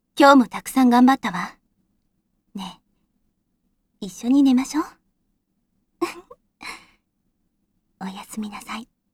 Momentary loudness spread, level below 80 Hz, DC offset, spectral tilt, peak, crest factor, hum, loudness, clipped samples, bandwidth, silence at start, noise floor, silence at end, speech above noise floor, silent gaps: 22 LU; -60 dBFS; under 0.1%; -4.5 dB/octave; 0 dBFS; 22 dB; none; -18 LUFS; under 0.1%; 15 kHz; 0.15 s; -71 dBFS; 0.3 s; 53 dB; none